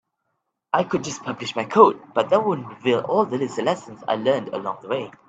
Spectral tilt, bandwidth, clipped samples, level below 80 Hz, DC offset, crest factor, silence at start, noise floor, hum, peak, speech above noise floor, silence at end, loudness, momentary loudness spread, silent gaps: -5 dB/octave; 8.4 kHz; under 0.1%; -68 dBFS; under 0.1%; 22 dB; 0.75 s; -76 dBFS; none; 0 dBFS; 55 dB; 0.2 s; -22 LUFS; 13 LU; none